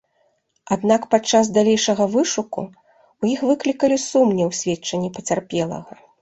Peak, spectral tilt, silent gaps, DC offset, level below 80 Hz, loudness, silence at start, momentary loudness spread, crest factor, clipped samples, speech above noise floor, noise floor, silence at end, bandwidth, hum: -2 dBFS; -4.5 dB/octave; none; under 0.1%; -60 dBFS; -20 LUFS; 0.7 s; 9 LU; 18 dB; under 0.1%; 46 dB; -65 dBFS; 0.3 s; 8.2 kHz; none